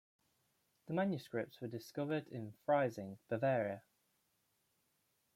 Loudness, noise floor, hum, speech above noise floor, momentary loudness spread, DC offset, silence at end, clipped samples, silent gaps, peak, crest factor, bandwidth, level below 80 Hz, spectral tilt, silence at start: -40 LUFS; -81 dBFS; none; 42 dB; 12 LU; under 0.1%; 1.55 s; under 0.1%; none; -22 dBFS; 20 dB; 16 kHz; -84 dBFS; -7.5 dB/octave; 0.9 s